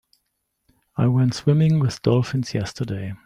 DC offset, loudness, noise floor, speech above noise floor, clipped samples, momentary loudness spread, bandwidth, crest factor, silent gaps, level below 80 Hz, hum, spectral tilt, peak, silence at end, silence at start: under 0.1%; -21 LUFS; -75 dBFS; 55 dB; under 0.1%; 10 LU; 11 kHz; 16 dB; none; -54 dBFS; none; -7.5 dB/octave; -4 dBFS; 0.1 s; 0.95 s